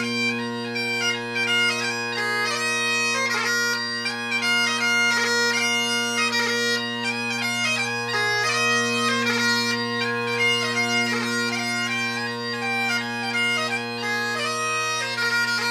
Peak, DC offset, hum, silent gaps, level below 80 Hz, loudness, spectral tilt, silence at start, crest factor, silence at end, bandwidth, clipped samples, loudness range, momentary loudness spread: -10 dBFS; under 0.1%; none; none; -74 dBFS; -22 LUFS; -2 dB/octave; 0 s; 14 dB; 0 s; 15.5 kHz; under 0.1%; 3 LU; 5 LU